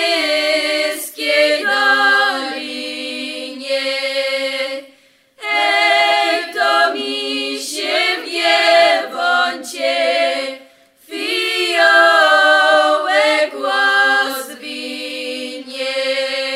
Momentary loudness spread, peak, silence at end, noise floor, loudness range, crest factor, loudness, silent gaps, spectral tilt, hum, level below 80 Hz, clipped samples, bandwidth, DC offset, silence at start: 14 LU; 0 dBFS; 0 s; -51 dBFS; 5 LU; 16 dB; -15 LUFS; none; 0.5 dB/octave; none; -74 dBFS; under 0.1%; 16 kHz; under 0.1%; 0 s